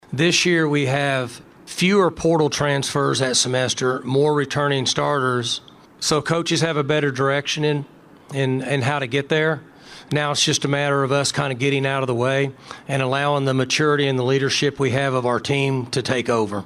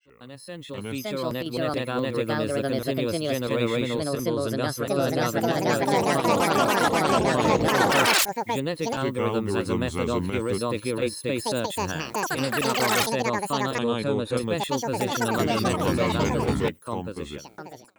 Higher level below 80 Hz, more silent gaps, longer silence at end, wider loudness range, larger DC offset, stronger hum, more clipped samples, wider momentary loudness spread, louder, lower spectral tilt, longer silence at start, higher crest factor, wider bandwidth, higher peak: second, -56 dBFS vs -50 dBFS; neither; second, 0 s vs 0.2 s; second, 2 LU vs 5 LU; neither; neither; neither; about the same, 6 LU vs 8 LU; first, -20 LUFS vs -25 LUFS; about the same, -4.5 dB/octave vs -4.5 dB/octave; about the same, 0.1 s vs 0.2 s; about the same, 18 dB vs 20 dB; second, 13.5 kHz vs over 20 kHz; first, -2 dBFS vs -6 dBFS